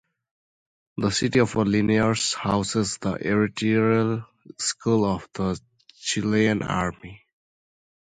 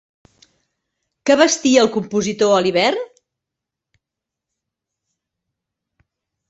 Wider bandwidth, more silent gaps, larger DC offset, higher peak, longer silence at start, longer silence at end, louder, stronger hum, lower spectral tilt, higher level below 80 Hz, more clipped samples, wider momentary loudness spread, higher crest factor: first, 9.4 kHz vs 8.2 kHz; neither; neither; second, -6 dBFS vs -2 dBFS; second, 0.95 s vs 1.25 s; second, 0.9 s vs 3.45 s; second, -24 LUFS vs -16 LUFS; neither; first, -5 dB/octave vs -3.5 dB/octave; first, -50 dBFS vs -62 dBFS; neither; second, 8 LU vs 11 LU; about the same, 18 dB vs 20 dB